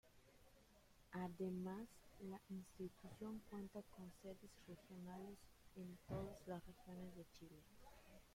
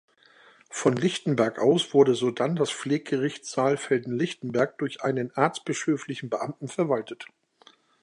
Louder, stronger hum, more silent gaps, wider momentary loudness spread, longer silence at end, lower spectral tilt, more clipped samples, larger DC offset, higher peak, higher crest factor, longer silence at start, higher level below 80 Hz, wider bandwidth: second, -55 LUFS vs -26 LUFS; neither; neither; first, 15 LU vs 10 LU; second, 0 s vs 0.75 s; first, -7 dB/octave vs -5.5 dB/octave; neither; neither; second, -36 dBFS vs -4 dBFS; about the same, 18 dB vs 22 dB; second, 0.05 s vs 0.7 s; about the same, -72 dBFS vs -72 dBFS; first, 16.5 kHz vs 11 kHz